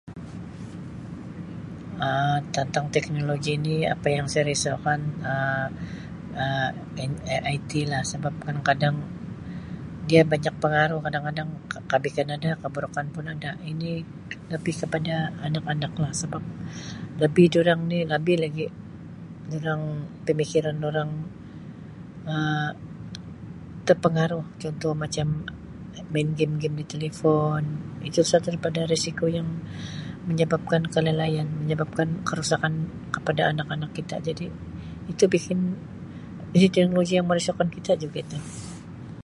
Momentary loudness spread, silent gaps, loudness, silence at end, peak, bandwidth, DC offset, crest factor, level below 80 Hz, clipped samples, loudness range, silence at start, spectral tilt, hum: 16 LU; none; -26 LUFS; 0 s; -4 dBFS; 11.5 kHz; under 0.1%; 22 dB; -52 dBFS; under 0.1%; 5 LU; 0.05 s; -5.5 dB/octave; none